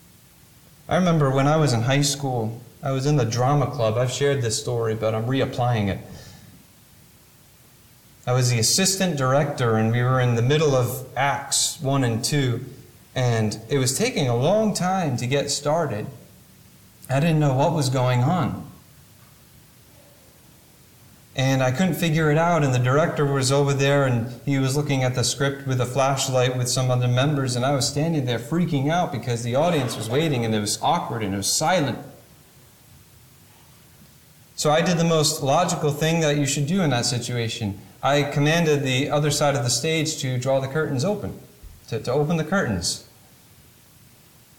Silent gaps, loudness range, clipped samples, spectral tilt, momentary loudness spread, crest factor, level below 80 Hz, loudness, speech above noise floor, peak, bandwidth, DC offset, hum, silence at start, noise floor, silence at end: none; 6 LU; under 0.1%; -5 dB/octave; 7 LU; 14 dB; -54 dBFS; -22 LUFS; 31 dB; -8 dBFS; 18.5 kHz; under 0.1%; none; 0.9 s; -52 dBFS; 1.55 s